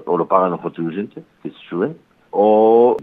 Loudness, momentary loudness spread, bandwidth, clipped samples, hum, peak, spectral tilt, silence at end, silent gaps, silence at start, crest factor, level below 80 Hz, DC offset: -17 LUFS; 21 LU; 3.9 kHz; under 0.1%; none; 0 dBFS; -10 dB/octave; 0 s; none; 0 s; 16 dB; -66 dBFS; under 0.1%